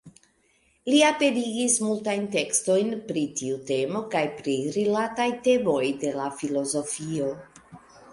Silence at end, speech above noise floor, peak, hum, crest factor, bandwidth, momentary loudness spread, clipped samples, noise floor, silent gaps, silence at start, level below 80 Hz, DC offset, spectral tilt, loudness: 0 s; 40 dB; -6 dBFS; none; 20 dB; 11.5 kHz; 8 LU; under 0.1%; -65 dBFS; none; 0.05 s; -66 dBFS; under 0.1%; -3.5 dB/octave; -25 LUFS